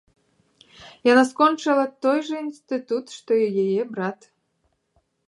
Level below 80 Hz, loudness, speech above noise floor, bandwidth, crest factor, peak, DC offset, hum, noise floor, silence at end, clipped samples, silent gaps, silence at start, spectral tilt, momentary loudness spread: -72 dBFS; -22 LUFS; 49 dB; 11.5 kHz; 20 dB; -4 dBFS; under 0.1%; none; -71 dBFS; 1.15 s; under 0.1%; none; 0.8 s; -5 dB/octave; 12 LU